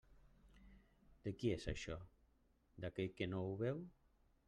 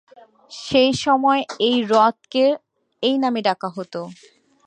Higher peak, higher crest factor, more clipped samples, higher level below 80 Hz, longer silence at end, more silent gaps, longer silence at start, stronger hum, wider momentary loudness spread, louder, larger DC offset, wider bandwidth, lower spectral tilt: second, -28 dBFS vs -2 dBFS; about the same, 20 dB vs 18 dB; neither; about the same, -62 dBFS vs -60 dBFS; about the same, 0.55 s vs 0.55 s; neither; second, 0.1 s vs 0.5 s; neither; second, 10 LU vs 15 LU; second, -46 LUFS vs -19 LUFS; neither; first, 11 kHz vs 9.6 kHz; first, -6.5 dB/octave vs -4.5 dB/octave